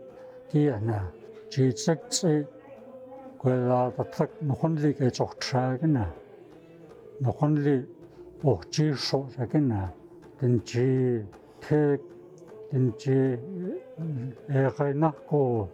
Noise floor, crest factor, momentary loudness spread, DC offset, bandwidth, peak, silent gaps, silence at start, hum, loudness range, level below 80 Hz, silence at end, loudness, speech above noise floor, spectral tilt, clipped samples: -50 dBFS; 18 dB; 20 LU; under 0.1%; 11 kHz; -10 dBFS; none; 0 s; none; 2 LU; -62 dBFS; 0 s; -27 LUFS; 24 dB; -6.5 dB/octave; under 0.1%